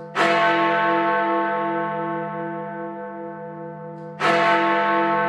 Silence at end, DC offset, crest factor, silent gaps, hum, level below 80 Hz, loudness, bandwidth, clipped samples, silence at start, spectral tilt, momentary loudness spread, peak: 0 s; under 0.1%; 16 dB; none; none; -74 dBFS; -21 LUFS; 11 kHz; under 0.1%; 0 s; -5.5 dB/octave; 17 LU; -6 dBFS